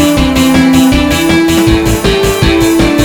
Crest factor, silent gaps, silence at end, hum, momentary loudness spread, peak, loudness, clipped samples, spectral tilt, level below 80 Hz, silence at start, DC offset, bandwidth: 8 dB; none; 0 s; none; 3 LU; 0 dBFS; -8 LUFS; 1%; -5 dB/octave; -20 dBFS; 0 s; 0.2%; over 20 kHz